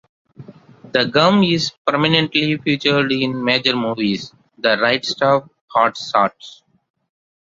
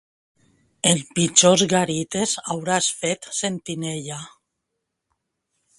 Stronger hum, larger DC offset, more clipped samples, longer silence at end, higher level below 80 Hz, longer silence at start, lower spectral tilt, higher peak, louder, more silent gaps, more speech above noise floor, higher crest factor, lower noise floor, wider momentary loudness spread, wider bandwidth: neither; neither; neither; second, 0.95 s vs 1.5 s; about the same, -58 dBFS vs -62 dBFS; second, 0.4 s vs 0.85 s; first, -5 dB/octave vs -3 dB/octave; about the same, 0 dBFS vs 0 dBFS; first, -17 LUFS vs -20 LUFS; first, 1.77-1.85 s, 5.61-5.68 s vs none; second, 25 dB vs 58 dB; second, 18 dB vs 24 dB; second, -42 dBFS vs -79 dBFS; second, 7 LU vs 14 LU; second, 7.8 kHz vs 11.5 kHz